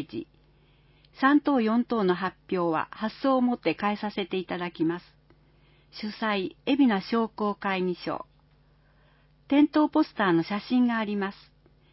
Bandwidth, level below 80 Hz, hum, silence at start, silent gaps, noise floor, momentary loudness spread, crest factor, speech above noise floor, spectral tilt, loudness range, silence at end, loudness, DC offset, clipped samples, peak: 5.8 kHz; -64 dBFS; none; 0 s; none; -61 dBFS; 11 LU; 18 dB; 35 dB; -10 dB/octave; 4 LU; 0.6 s; -27 LUFS; under 0.1%; under 0.1%; -10 dBFS